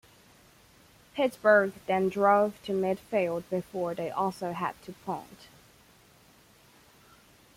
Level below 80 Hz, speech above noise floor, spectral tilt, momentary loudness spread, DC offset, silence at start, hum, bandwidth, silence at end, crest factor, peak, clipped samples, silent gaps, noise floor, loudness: -68 dBFS; 31 dB; -6 dB/octave; 15 LU; under 0.1%; 1.15 s; none; 16 kHz; 2.1 s; 20 dB; -10 dBFS; under 0.1%; none; -59 dBFS; -28 LUFS